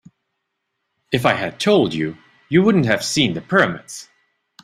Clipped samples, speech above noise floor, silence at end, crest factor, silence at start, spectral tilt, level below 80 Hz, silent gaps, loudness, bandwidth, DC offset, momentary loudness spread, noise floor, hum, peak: under 0.1%; 58 dB; 0.6 s; 20 dB; 1.1 s; -5 dB/octave; -54 dBFS; none; -18 LUFS; 15 kHz; under 0.1%; 12 LU; -76 dBFS; none; 0 dBFS